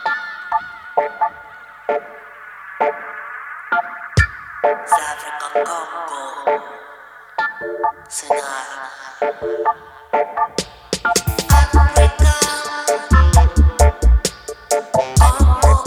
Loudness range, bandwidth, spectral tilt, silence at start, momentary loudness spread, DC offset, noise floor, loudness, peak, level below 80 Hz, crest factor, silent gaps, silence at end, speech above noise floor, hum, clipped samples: 9 LU; 18.5 kHz; -4.5 dB/octave; 0 s; 17 LU; under 0.1%; -40 dBFS; -18 LUFS; 0 dBFS; -20 dBFS; 16 dB; none; 0 s; 18 dB; 50 Hz at -55 dBFS; under 0.1%